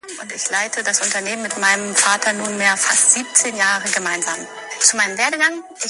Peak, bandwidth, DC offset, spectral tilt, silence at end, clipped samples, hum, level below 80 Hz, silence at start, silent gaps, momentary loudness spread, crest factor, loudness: 0 dBFS; 12 kHz; under 0.1%; 0 dB/octave; 0 s; under 0.1%; none; -70 dBFS; 0.05 s; none; 10 LU; 18 dB; -16 LUFS